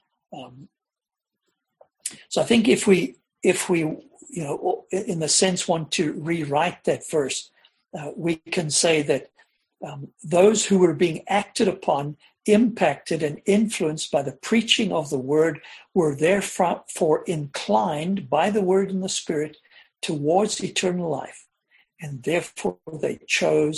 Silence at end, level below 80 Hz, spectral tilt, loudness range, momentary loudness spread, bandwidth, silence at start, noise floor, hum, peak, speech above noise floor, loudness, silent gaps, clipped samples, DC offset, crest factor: 0 s; -62 dBFS; -4 dB/octave; 4 LU; 15 LU; 12.5 kHz; 0.3 s; -89 dBFS; none; -2 dBFS; 66 dB; -23 LUFS; none; under 0.1%; under 0.1%; 22 dB